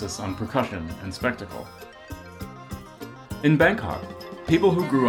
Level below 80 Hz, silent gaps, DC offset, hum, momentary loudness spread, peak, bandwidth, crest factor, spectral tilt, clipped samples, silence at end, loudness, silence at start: -48 dBFS; none; under 0.1%; none; 21 LU; -6 dBFS; 19 kHz; 18 dB; -6 dB/octave; under 0.1%; 0 s; -24 LUFS; 0 s